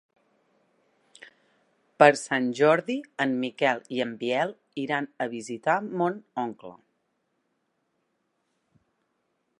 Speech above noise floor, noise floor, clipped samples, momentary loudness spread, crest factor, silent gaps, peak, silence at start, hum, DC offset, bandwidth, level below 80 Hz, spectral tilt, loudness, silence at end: 50 dB; -76 dBFS; under 0.1%; 14 LU; 26 dB; none; -2 dBFS; 2 s; none; under 0.1%; 11.5 kHz; -82 dBFS; -5 dB/octave; -26 LUFS; 2.85 s